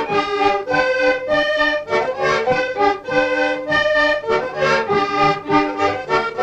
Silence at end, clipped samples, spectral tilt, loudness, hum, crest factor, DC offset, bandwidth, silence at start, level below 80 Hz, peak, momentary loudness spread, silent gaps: 0 s; under 0.1%; -4.5 dB/octave; -17 LUFS; none; 14 dB; under 0.1%; 9 kHz; 0 s; -46 dBFS; -4 dBFS; 3 LU; none